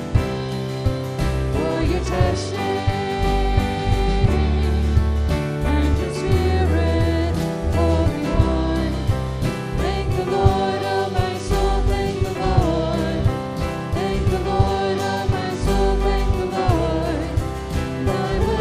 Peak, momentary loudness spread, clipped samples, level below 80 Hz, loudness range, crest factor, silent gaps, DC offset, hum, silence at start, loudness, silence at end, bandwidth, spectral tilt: -2 dBFS; 5 LU; under 0.1%; -26 dBFS; 2 LU; 18 dB; none; under 0.1%; none; 0 s; -21 LUFS; 0 s; 15 kHz; -7 dB/octave